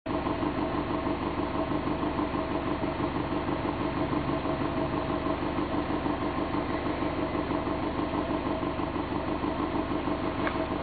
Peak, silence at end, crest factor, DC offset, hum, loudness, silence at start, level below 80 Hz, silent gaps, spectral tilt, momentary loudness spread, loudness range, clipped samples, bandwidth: -16 dBFS; 0 s; 14 dB; under 0.1%; none; -30 LUFS; 0.05 s; -44 dBFS; none; -10.5 dB/octave; 1 LU; 0 LU; under 0.1%; 4.8 kHz